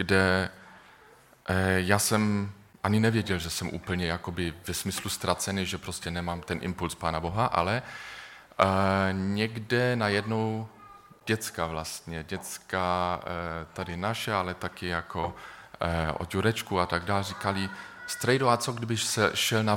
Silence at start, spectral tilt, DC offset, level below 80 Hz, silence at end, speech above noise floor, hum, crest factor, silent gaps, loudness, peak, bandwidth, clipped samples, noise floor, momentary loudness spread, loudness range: 0 s; -4.5 dB/octave; under 0.1%; -52 dBFS; 0 s; 28 dB; none; 24 dB; none; -29 LUFS; -6 dBFS; 17.5 kHz; under 0.1%; -56 dBFS; 12 LU; 4 LU